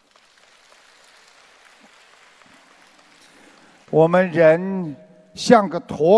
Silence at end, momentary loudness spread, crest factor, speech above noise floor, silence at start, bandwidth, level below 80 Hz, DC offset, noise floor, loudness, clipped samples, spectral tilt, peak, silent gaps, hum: 0 s; 17 LU; 20 dB; 39 dB; 3.9 s; 11 kHz; -62 dBFS; under 0.1%; -55 dBFS; -17 LUFS; under 0.1%; -6 dB/octave; 0 dBFS; none; none